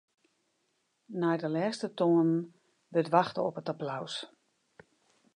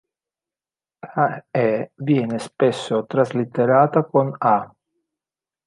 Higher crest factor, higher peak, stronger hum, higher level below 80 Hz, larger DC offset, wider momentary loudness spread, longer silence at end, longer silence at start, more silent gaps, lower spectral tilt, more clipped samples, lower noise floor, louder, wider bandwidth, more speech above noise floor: about the same, 22 dB vs 20 dB; second, -10 dBFS vs -2 dBFS; neither; second, -82 dBFS vs -68 dBFS; neither; first, 13 LU vs 8 LU; about the same, 1.1 s vs 1 s; about the same, 1.1 s vs 1.05 s; neither; about the same, -6.5 dB/octave vs -7.5 dB/octave; neither; second, -77 dBFS vs under -90 dBFS; second, -31 LUFS vs -20 LUFS; about the same, 10.5 kHz vs 11.5 kHz; second, 47 dB vs over 71 dB